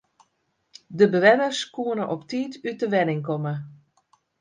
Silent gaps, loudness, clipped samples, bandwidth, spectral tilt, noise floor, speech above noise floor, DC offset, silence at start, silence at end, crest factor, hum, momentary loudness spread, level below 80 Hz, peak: none; -23 LUFS; under 0.1%; 9.6 kHz; -5.5 dB/octave; -72 dBFS; 49 dB; under 0.1%; 0.9 s; 0.65 s; 22 dB; none; 14 LU; -72 dBFS; -4 dBFS